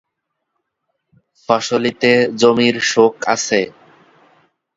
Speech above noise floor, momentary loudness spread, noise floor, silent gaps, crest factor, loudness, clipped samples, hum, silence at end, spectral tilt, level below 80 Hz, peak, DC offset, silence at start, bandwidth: 61 dB; 6 LU; -75 dBFS; none; 18 dB; -15 LUFS; under 0.1%; none; 1.1 s; -3.5 dB/octave; -62 dBFS; 0 dBFS; under 0.1%; 1.5 s; 7.8 kHz